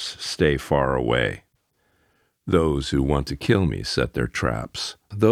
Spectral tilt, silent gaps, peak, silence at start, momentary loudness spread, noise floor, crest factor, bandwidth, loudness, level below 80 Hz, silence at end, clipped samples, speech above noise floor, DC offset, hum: -5.5 dB/octave; none; -4 dBFS; 0 s; 9 LU; -68 dBFS; 18 dB; 15 kHz; -23 LUFS; -38 dBFS; 0 s; under 0.1%; 46 dB; under 0.1%; none